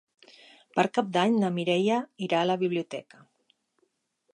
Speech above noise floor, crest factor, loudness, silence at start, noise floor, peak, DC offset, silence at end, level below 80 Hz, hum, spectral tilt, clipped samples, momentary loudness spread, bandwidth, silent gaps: 47 dB; 20 dB; -27 LUFS; 0.75 s; -74 dBFS; -8 dBFS; under 0.1%; 1.35 s; -78 dBFS; none; -6 dB/octave; under 0.1%; 8 LU; 10.5 kHz; none